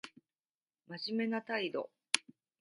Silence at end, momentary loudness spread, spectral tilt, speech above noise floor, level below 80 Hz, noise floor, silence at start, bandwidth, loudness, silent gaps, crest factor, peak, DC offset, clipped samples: 0.4 s; 11 LU; -2.5 dB/octave; over 53 dB; under -90 dBFS; under -90 dBFS; 0.05 s; 11 kHz; -37 LUFS; 0.40-0.60 s; 34 dB; -6 dBFS; under 0.1%; under 0.1%